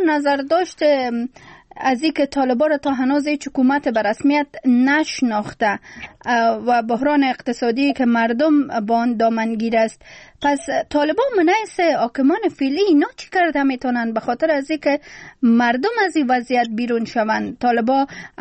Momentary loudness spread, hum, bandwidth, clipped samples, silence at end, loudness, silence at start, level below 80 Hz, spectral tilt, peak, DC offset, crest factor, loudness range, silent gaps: 5 LU; none; 8.8 kHz; under 0.1%; 0.15 s; -18 LUFS; 0 s; -56 dBFS; -5 dB/octave; -6 dBFS; under 0.1%; 12 dB; 1 LU; none